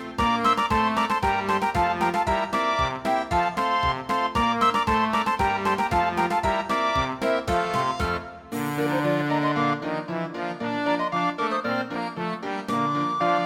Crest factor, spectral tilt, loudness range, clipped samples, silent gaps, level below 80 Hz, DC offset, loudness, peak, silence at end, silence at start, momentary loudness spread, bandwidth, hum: 16 dB; -5.5 dB/octave; 3 LU; under 0.1%; none; -42 dBFS; under 0.1%; -24 LUFS; -8 dBFS; 0 s; 0 s; 8 LU; 17.5 kHz; none